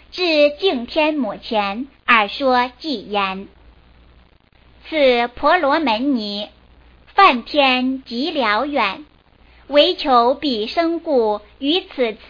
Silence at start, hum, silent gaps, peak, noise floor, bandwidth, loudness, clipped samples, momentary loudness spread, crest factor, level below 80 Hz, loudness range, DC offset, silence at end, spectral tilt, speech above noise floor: 0.15 s; none; none; 0 dBFS; -52 dBFS; 5.2 kHz; -17 LUFS; under 0.1%; 9 LU; 18 dB; -50 dBFS; 4 LU; under 0.1%; 0.15 s; -5 dB/octave; 34 dB